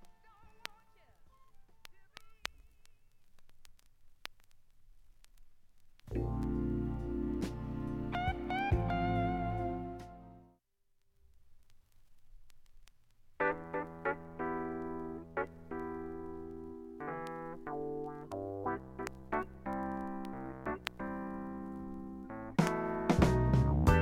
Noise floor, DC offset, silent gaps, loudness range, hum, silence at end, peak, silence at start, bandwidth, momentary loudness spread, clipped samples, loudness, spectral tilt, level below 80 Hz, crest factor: -74 dBFS; under 0.1%; none; 17 LU; none; 0 s; -12 dBFS; 0 s; 16 kHz; 15 LU; under 0.1%; -37 LUFS; -7 dB/octave; -46 dBFS; 26 dB